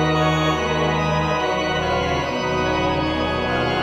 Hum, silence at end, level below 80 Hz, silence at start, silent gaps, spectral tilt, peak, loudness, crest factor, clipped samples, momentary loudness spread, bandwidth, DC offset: none; 0 s; -36 dBFS; 0 s; none; -5.5 dB/octave; -6 dBFS; -20 LUFS; 14 dB; under 0.1%; 3 LU; 16 kHz; under 0.1%